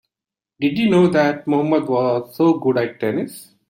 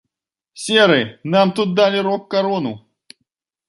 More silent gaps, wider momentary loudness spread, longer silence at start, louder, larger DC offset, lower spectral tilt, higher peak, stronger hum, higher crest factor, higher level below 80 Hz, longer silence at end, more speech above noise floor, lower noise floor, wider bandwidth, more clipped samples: neither; second, 8 LU vs 13 LU; about the same, 0.6 s vs 0.55 s; about the same, -18 LUFS vs -17 LUFS; neither; first, -7 dB/octave vs -5 dB/octave; about the same, -4 dBFS vs -2 dBFS; neither; about the same, 14 dB vs 18 dB; about the same, -60 dBFS vs -64 dBFS; second, 0.25 s vs 0.9 s; first, 71 dB vs 64 dB; first, -89 dBFS vs -81 dBFS; first, 16.5 kHz vs 11.5 kHz; neither